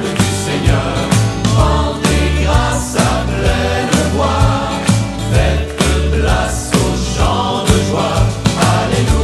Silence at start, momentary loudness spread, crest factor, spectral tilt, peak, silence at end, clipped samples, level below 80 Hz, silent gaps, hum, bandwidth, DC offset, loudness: 0 s; 2 LU; 14 dB; -5 dB/octave; 0 dBFS; 0 s; under 0.1%; -20 dBFS; none; none; 13.5 kHz; under 0.1%; -14 LUFS